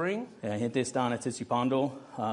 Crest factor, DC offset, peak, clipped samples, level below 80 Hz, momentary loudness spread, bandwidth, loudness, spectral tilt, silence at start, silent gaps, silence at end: 16 dB; under 0.1%; -14 dBFS; under 0.1%; -72 dBFS; 7 LU; 11 kHz; -31 LUFS; -5.5 dB/octave; 0 s; none; 0 s